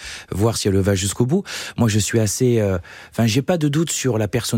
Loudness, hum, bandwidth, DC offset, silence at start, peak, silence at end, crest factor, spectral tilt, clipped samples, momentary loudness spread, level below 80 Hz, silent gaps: -19 LUFS; none; 16.5 kHz; under 0.1%; 0 s; -4 dBFS; 0 s; 14 dB; -5 dB/octave; under 0.1%; 5 LU; -50 dBFS; none